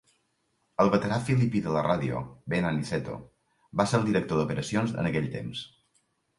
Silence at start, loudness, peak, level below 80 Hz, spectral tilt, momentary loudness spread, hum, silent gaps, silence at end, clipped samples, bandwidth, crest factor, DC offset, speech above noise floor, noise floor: 0.8 s; -28 LUFS; -8 dBFS; -56 dBFS; -6.5 dB/octave; 13 LU; none; none; 0.7 s; under 0.1%; 11.5 kHz; 22 dB; under 0.1%; 47 dB; -74 dBFS